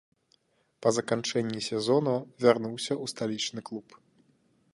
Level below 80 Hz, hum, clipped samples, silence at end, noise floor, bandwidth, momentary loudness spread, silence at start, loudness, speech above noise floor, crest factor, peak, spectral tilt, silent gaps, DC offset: -74 dBFS; none; under 0.1%; 0.95 s; -69 dBFS; 11.5 kHz; 8 LU; 0.8 s; -29 LUFS; 41 dB; 22 dB; -8 dBFS; -4.5 dB/octave; none; under 0.1%